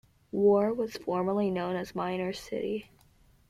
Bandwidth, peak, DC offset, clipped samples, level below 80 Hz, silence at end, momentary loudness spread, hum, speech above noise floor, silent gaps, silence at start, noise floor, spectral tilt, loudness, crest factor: 13.5 kHz; -14 dBFS; under 0.1%; under 0.1%; -64 dBFS; 0.65 s; 11 LU; none; 33 dB; none; 0.35 s; -62 dBFS; -7 dB/octave; -30 LUFS; 16 dB